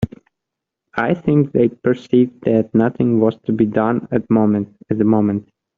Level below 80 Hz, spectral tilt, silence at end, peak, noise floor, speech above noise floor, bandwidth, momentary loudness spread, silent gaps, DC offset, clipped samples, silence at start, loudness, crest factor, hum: -52 dBFS; -8 dB/octave; 0.35 s; -2 dBFS; -82 dBFS; 66 dB; 4.6 kHz; 6 LU; none; under 0.1%; under 0.1%; 0 s; -17 LUFS; 16 dB; none